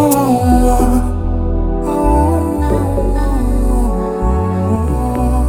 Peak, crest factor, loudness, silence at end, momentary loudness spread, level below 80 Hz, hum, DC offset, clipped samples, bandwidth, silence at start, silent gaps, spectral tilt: 0 dBFS; 12 dB; -15 LUFS; 0 s; 6 LU; -16 dBFS; none; under 0.1%; under 0.1%; over 20 kHz; 0 s; none; -7.5 dB/octave